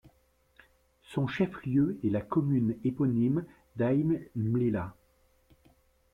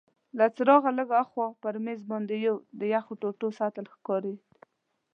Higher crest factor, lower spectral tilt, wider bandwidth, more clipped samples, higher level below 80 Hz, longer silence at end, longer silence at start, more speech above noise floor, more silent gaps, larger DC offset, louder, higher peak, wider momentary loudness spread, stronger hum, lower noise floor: second, 14 dB vs 22 dB; first, -9.5 dB/octave vs -8 dB/octave; first, 10.5 kHz vs 6.8 kHz; neither; first, -60 dBFS vs -90 dBFS; first, 1.2 s vs 0.75 s; first, 1.1 s vs 0.35 s; about the same, 39 dB vs 40 dB; neither; neither; about the same, -30 LUFS vs -28 LUFS; second, -16 dBFS vs -8 dBFS; second, 7 LU vs 13 LU; neither; about the same, -68 dBFS vs -68 dBFS